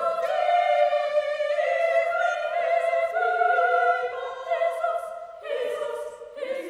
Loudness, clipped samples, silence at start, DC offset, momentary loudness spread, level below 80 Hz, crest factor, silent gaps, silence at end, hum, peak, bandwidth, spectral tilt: -24 LUFS; under 0.1%; 0 s; under 0.1%; 11 LU; -72 dBFS; 16 dB; none; 0 s; none; -10 dBFS; 12 kHz; -1.5 dB/octave